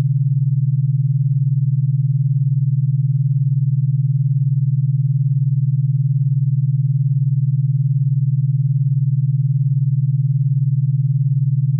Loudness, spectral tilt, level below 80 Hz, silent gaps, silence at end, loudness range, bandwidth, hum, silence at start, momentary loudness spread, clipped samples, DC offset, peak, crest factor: -18 LUFS; -31 dB/octave; -72 dBFS; none; 0 s; 0 LU; 0.2 kHz; none; 0 s; 0 LU; under 0.1%; under 0.1%; -10 dBFS; 6 dB